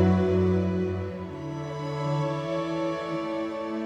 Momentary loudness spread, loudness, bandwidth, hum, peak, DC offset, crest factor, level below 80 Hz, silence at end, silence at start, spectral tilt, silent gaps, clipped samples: 11 LU; -28 LUFS; 8.6 kHz; none; -10 dBFS; under 0.1%; 18 dB; -54 dBFS; 0 s; 0 s; -8 dB/octave; none; under 0.1%